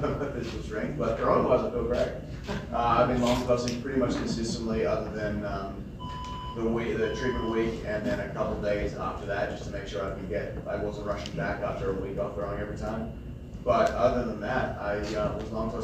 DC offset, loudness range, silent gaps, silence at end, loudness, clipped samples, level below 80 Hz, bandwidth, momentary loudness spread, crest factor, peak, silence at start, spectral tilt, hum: under 0.1%; 6 LU; none; 0 s; -30 LUFS; under 0.1%; -42 dBFS; 15 kHz; 11 LU; 18 dB; -10 dBFS; 0 s; -6 dB/octave; none